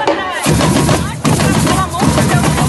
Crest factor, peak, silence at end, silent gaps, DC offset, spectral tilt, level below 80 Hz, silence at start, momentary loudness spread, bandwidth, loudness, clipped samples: 12 dB; 0 dBFS; 0 s; none; under 0.1%; -5 dB/octave; -28 dBFS; 0 s; 3 LU; 13 kHz; -12 LUFS; under 0.1%